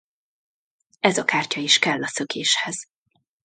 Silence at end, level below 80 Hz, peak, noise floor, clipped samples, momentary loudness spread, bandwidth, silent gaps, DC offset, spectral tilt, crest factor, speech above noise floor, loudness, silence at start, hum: 0.6 s; -72 dBFS; 0 dBFS; -71 dBFS; under 0.1%; 9 LU; 9.6 kHz; none; under 0.1%; -2 dB/octave; 24 dB; 49 dB; -21 LUFS; 1.05 s; none